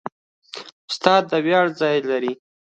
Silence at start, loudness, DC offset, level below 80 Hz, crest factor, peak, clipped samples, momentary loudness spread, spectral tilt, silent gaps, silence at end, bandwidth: 0.05 s; -20 LUFS; under 0.1%; -70 dBFS; 20 dB; 0 dBFS; under 0.1%; 19 LU; -5 dB/octave; 0.12-0.42 s, 0.72-0.88 s; 0.4 s; 9 kHz